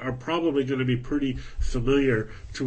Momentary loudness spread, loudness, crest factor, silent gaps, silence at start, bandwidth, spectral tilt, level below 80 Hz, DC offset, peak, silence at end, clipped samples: 9 LU; -26 LUFS; 14 dB; none; 0 s; 8.6 kHz; -6.5 dB/octave; -34 dBFS; under 0.1%; -10 dBFS; 0 s; under 0.1%